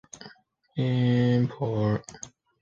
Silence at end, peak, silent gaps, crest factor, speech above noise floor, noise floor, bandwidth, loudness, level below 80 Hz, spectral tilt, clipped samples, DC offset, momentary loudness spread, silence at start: 0.35 s; -12 dBFS; none; 16 dB; 30 dB; -55 dBFS; 7.8 kHz; -26 LUFS; -58 dBFS; -7 dB/octave; under 0.1%; under 0.1%; 22 LU; 0.15 s